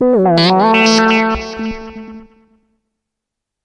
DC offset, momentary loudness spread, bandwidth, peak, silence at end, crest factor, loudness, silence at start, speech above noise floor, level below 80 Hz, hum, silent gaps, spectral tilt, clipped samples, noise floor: under 0.1%; 19 LU; 10.5 kHz; -2 dBFS; 1.4 s; 14 dB; -11 LUFS; 0 s; 69 dB; -40 dBFS; none; none; -4.5 dB/octave; under 0.1%; -80 dBFS